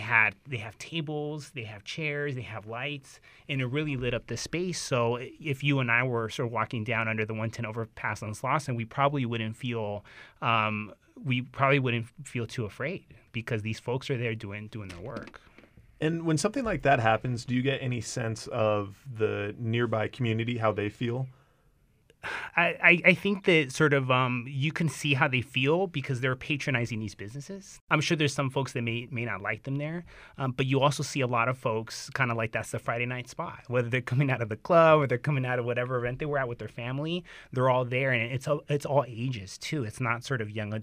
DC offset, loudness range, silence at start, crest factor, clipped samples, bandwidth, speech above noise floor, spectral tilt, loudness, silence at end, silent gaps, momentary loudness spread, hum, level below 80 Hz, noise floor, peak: under 0.1%; 7 LU; 0 s; 24 dB; under 0.1%; 15.5 kHz; 36 dB; -5.5 dB/octave; -29 LUFS; 0 s; 27.81-27.87 s; 13 LU; none; -60 dBFS; -65 dBFS; -4 dBFS